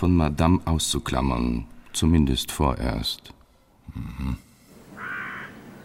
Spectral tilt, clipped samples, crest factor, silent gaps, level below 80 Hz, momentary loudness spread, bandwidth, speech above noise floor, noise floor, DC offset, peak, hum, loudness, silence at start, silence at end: -5 dB/octave; under 0.1%; 18 dB; none; -34 dBFS; 17 LU; 16.5 kHz; 33 dB; -56 dBFS; under 0.1%; -8 dBFS; none; -25 LUFS; 0 s; 0 s